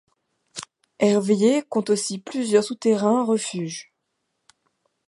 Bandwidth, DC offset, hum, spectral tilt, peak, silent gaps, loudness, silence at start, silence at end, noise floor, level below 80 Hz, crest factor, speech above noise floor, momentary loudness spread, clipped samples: 11.5 kHz; under 0.1%; none; -5 dB/octave; -6 dBFS; none; -22 LUFS; 0.55 s; 1.25 s; -76 dBFS; -74 dBFS; 18 dB; 55 dB; 18 LU; under 0.1%